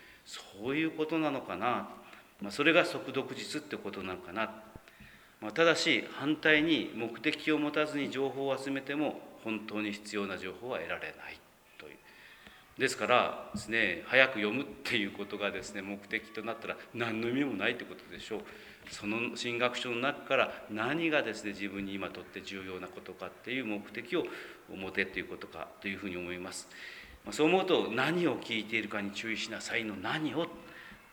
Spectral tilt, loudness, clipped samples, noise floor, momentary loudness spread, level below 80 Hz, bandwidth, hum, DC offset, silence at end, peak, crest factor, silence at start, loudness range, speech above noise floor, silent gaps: -4 dB/octave; -33 LUFS; under 0.1%; -56 dBFS; 18 LU; -68 dBFS; over 20 kHz; none; under 0.1%; 0.05 s; -8 dBFS; 26 dB; 0 s; 8 LU; 23 dB; none